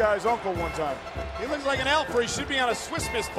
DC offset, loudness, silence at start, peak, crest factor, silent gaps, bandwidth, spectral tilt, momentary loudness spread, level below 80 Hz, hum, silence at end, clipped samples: under 0.1%; -27 LUFS; 0 s; -10 dBFS; 16 dB; none; 15.5 kHz; -3.5 dB/octave; 8 LU; -44 dBFS; none; 0 s; under 0.1%